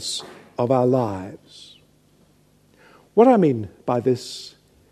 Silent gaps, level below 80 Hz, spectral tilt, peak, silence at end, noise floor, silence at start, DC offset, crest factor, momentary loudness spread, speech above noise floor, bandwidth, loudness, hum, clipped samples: none; -64 dBFS; -6 dB/octave; -2 dBFS; 0.45 s; -58 dBFS; 0 s; under 0.1%; 22 dB; 21 LU; 38 dB; 13.5 kHz; -20 LUFS; 50 Hz at -55 dBFS; under 0.1%